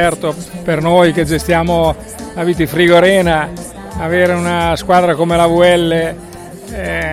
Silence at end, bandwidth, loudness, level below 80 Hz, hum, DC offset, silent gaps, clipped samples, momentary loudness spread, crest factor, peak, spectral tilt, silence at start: 0 s; 15.5 kHz; -13 LUFS; -32 dBFS; none; under 0.1%; none; under 0.1%; 16 LU; 12 dB; 0 dBFS; -5.5 dB/octave; 0 s